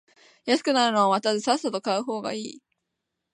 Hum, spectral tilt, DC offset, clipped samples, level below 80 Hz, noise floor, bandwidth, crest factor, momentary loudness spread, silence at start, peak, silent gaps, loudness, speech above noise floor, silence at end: none; -3.5 dB/octave; under 0.1%; under 0.1%; -80 dBFS; -82 dBFS; 11.5 kHz; 18 dB; 13 LU; 0.45 s; -8 dBFS; none; -24 LUFS; 58 dB; 0.75 s